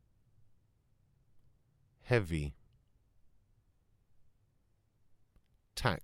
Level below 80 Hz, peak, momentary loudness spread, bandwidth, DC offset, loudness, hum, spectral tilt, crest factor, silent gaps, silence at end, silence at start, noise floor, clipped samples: -56 dBFS; -14 dBFS; 13 LU; 16 kHz; under 0.1%; -35 LUFS; none; -6 dB/octave; 28 dB; none; 0 s; 2.05 s; -74 dBFS; under 0.1%